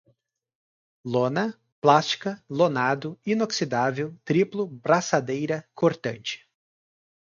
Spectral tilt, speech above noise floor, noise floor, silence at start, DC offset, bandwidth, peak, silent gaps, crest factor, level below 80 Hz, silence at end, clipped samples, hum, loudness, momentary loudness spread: -5 dB/octave; 44 dB; -68 dBFS; 1.05 s; under 0.1%; 7.6 kHz; -4 dBFS; 1.72-1.82 s; 22 dB; -70 dBFS; 0.85 s; under 0.1%; none; -25 LUFS; 10 LU